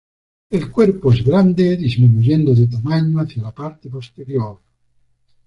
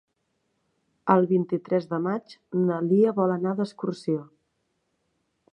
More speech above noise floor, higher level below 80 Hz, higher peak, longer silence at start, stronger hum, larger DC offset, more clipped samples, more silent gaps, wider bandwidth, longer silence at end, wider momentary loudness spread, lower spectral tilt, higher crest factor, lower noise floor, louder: second, 44 dB vs 51 dB; first, -44 dBFS vs -76 dBFS; about the same, -2 dBFS vs -4 dBFS; second, 0.5 s vs 1.05 s; neither; neither; neither; neither; second, 6.6 kHz vs 9.8 kHz; second, 0.9 s vs 1.3 s; first, 16 LU vs 10 LU; about the same, -9.5 dB/octave vs -9 dB/octave; second, 14 dB vs 22 dB; second, -59 dBFS vs -75 dBFS; first, -16 LUFS vs -25 LUFS